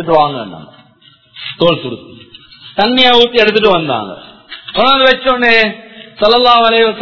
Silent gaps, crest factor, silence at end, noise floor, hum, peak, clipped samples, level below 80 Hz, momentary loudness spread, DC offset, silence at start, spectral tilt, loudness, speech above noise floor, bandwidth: none; 12 dB; 0 s; -46 dBFS; none; 0 dBFS; 0.5%; -44 dBFS; 20 LU; under 0.1%; 0 s; -5.5 dB/octave; -10 LUFS; 36 dB; 6 kHz